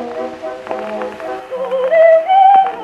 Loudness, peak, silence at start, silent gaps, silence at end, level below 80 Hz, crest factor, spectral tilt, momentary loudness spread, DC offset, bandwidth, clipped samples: -11 LUFS; 0 dBFS; 0 s; none; 0 s; -60 dBFS; 12 dB; -4.5 dB/octave; 16 LU; under 0.1%; 7.2 kHz; under 0.1%